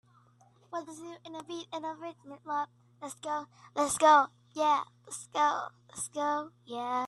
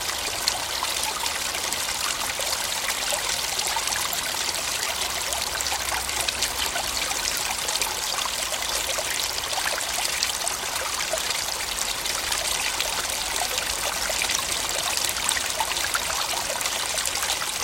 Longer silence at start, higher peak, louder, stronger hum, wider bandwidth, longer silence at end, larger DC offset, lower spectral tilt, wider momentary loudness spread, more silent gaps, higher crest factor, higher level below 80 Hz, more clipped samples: first, 0.7 s vs 0 s; second, -10 dBFS vs -2 dBFS; second, -31 LUFS vs -24 LUFS; neither; second, 12.5 kHz vs 17 kHz; about the same, 0 s vs 0 s; neither; first, -2.5 dB/octave vs 0.5 dB/octave; first, 20 LU vs 2 LU; neither; about the same, 22 dB vs 24 dB; second, -76 dBFS vs -48 dBFS; neither